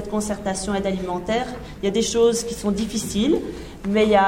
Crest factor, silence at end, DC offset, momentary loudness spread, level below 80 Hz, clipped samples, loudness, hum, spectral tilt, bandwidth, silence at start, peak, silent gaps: 18 dB; 0 s; under 0.1%; 8 LU; -42 dBFS; under 0.1%; -23 LUFS; none; -4.5 dB/octave; 16.5 kHz; 0 s; -4 dBFS; none